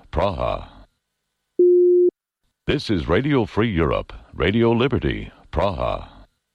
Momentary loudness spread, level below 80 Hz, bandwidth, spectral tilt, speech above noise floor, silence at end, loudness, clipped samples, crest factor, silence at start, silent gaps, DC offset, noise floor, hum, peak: 15 LU; -36 dBFS; 6.8 kHz; -8 dB/octave; 56 dB; 0.5 s; -20 LUFS; under 0.1%; 14 dB; 0.15 s; none; under 0.1%; -77 dBFS; none; -8 dBFS